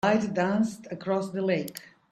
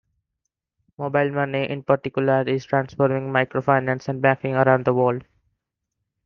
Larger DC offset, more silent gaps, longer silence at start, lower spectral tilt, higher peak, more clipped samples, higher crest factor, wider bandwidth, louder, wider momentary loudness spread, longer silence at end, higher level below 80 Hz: neither; neither; second, 0.05 s vs 1 s; second, -6 dB/octave vs -8 dB/octave; second, -8 dBFS vs -2 dBFS; neither; about the same, 20 dB vs 20 dB; first, 15 kHz vs 6.6 kHz; second, -28 LUFS vs -21 LUFS; first, 12 LU vs 6 LU; second, 0.3 s vs 1.05 s; about the same, -66 dBFS vs -62 dBFS